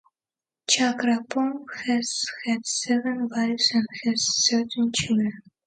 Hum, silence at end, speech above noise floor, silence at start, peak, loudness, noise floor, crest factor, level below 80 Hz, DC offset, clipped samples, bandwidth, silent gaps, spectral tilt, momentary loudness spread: none; 0.25 s; over 66 dB; 0.7 s; -6 dBFS; -24 LUFS; under -90 dBFS; 18 dB; -62 dBFS; under 0.1%; under 0.1%; 9.4 kHz; none; -2.5 dB/octave; 7 LU